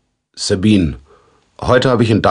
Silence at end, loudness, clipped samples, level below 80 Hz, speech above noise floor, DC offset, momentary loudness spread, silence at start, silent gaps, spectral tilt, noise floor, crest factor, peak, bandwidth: 0 s; -14 LUFS; under 0.1%; -36 dBFS; 39 dB; under 0.1%; 11 LU; 0.35 s; none; -6 dB/octave; -51 dBFS; 14 dB; 0 dBFS; 10.5 kHz